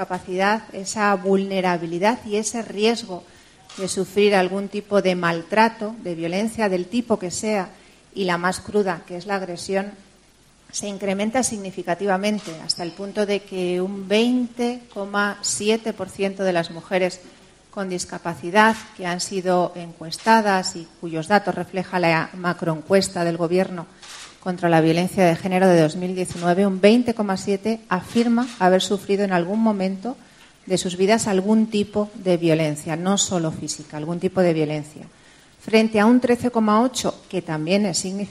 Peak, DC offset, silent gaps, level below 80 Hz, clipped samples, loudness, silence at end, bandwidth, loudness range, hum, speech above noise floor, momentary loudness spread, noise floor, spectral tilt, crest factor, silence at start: 0 dBFS; under 0.1%; none; -58 dBFS; under 0.1%; -21 LUFS; 0 s; 13.5 kHz; 5 LU; none; 33 dB; 12 LU; -54 dBFS; -4.5 dB/octave; 22 dB; 0 s